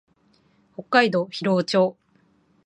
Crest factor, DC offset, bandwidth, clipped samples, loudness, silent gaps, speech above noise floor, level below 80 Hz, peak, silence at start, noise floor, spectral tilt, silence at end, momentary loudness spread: 22 dB; under 0.1%; 10.5 kHz; under 0.1%; -21 LUFS; none; 41 dB; -72 dBFS; -2 dBFS; 0.8 s; -62 dBFS; -5.5 dB/octave; 0.75 s; 16 LU